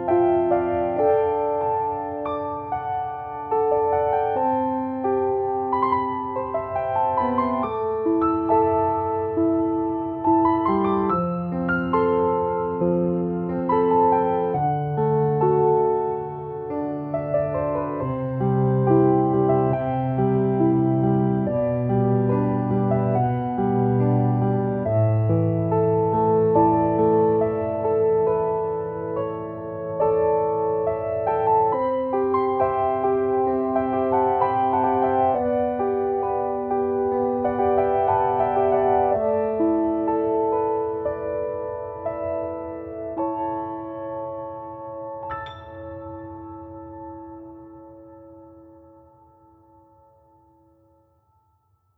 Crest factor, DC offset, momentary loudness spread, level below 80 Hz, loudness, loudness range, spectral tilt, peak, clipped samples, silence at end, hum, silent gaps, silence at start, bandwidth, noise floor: 16 dB; under 0.1%; 12 LU; -50 dBFS; -22 LUFS; 9 LU; -12 dB/octave; -6 dBFS; under 0.1%; 3.35 s; none; none; 0 s; 4.3 kHz; -65 dBFS